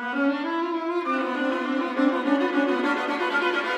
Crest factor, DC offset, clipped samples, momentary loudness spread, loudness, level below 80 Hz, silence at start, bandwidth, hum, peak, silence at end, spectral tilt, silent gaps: 14 dB; under 0.1%; under 0.1%; 4 LU; -24 LUFS; -80 dBFS; 0 s; 10 kHz; none; -10 dBFS; 0 s; -4 dB/octave; none